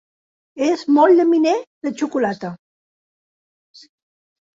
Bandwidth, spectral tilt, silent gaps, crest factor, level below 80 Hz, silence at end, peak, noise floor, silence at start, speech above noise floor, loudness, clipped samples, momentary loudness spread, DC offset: 7.8 kHz; -5.5 dB/octave; 1.67-1.81 s; 18 dB; -68 dBFS; 2.05 s; -2 dBFS; under -90 dBFS; 0.55 s; over 73 dB; -17 LUFS; under 0.1%; 15 LU; under 0.1%